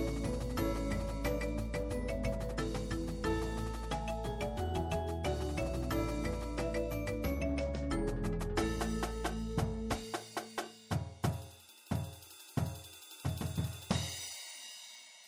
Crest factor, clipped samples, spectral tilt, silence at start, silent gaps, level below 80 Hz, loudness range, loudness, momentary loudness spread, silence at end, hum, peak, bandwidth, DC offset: 20 dB; under 0.1%; -5.5 dB/octave; 0 s; none; -42 dBFS; 4 LU; -38 LUFS; 7 LU; 0 s; none; -16 dBFS; over 20 kHz; under 0.1%